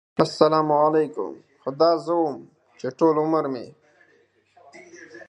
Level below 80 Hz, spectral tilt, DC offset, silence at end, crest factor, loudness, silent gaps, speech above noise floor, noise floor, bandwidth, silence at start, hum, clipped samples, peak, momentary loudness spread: -70 dBFS; -6.5 dB/octave; under 0.1%; 0.05 s; 22 dB; -21 LUFS; none; 40 dB; -61 dBFS; 10.5 kHz; 0.2 s; none; under 0.1%; -2 dBFS; 16 LU